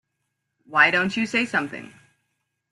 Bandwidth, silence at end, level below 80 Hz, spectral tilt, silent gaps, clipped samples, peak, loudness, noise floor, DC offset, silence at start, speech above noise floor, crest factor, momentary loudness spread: 12 kHz; 0.85 s; -68 dBFS; -4 dB/octave; none; under 0.1%; -2 dBFS; -21 LUFS; -78 dBFS; under 0.1%; 0.7 s; 56 dB; 22 dB; 14 LU